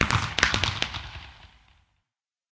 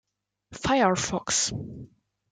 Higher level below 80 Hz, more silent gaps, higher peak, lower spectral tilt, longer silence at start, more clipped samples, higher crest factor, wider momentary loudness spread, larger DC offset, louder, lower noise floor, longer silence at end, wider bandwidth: first, -42 dBFS vs -52 dBFS; neither; first, -2 dBFS vs -8 dBFS; about the same, -3 dB/octave vs -3 dB/octave; second, 0 s vs 0.5 s; neither; first, 28 dB vs 20 dB; first, 20 LU vs 17 LU; neither; about the same, -25 LUFS vs -25 LUFS; first, -86 dBFS vs -58 dBFS; first, 1.05 s vs 0.45 s; second, 8 kHz vs 10 kHz